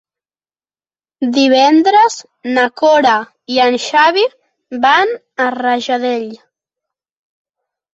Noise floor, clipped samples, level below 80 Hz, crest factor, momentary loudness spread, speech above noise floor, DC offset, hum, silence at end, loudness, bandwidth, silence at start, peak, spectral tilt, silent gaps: under -90 dBFS; under 0.1%; -62 dBFS; 14 dB; 10 LU; over 78 dB; under 0.1%; none; 1.55 s; -13 LUFS; 8.2 kHz; 1.2 s; 0 dBFS; -2.5 dB/octave; none